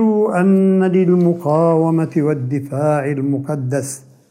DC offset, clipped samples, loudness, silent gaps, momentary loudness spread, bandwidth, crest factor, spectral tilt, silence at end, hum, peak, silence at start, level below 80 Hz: under 0.1%; under 0.1%; -16 LUFS; none; 8 LU; 14.5 kHz; 12 dB; -8.5 dB/octave; 0.3 s; none; -4 dBFS; 0 s; -66 dBFS